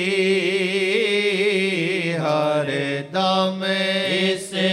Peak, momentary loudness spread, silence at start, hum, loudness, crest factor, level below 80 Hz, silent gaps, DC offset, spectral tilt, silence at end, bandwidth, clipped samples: -8 dBFS; 3 LU; 0 s; none; -20 LUFS; 14 dB; -74 dBFS; none; under 0.1%; -4.5 dB/octave; 0 s; 13 kHz; under 0.1%